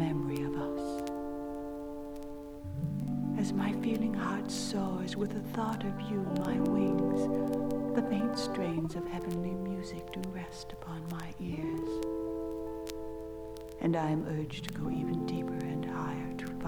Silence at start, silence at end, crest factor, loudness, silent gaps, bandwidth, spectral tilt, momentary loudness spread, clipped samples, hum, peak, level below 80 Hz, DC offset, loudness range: 0 s; 0 s; 18 dB; -35 LUFS; none; over 20 kHz; -6.5 dB/octave; 11 LU; under 0.1%; none; -16 dBFS; -54 dBFS; under 0.1%; 6 LU